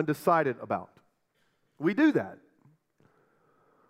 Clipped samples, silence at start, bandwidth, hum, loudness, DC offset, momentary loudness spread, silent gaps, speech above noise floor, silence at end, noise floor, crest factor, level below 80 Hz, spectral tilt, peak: under 0.1%; 0 s; 16 kHz; none; -28 LUFS; under 0.1%; 10 LU; none; 46 dB; 1.55 s; -73 dBFS; 20 dB; -80 dBFS; -7 dB/octave; -12 dBFS